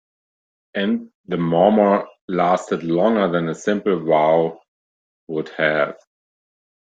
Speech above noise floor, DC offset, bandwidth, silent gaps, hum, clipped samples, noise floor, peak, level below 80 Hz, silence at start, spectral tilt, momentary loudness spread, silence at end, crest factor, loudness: over 72 dB; under 0.1%; 9 kHz; 1.14-1.24 s, 2.21-2.28 s, 4.68-5.27 s; none; under 0.1%; under -90 dBFS; -2 dBFS; -64 dBFS; 0.75 s; -6.5 dB/octave; 11 LU; 0.9 s; 18 dB; -19 LUFS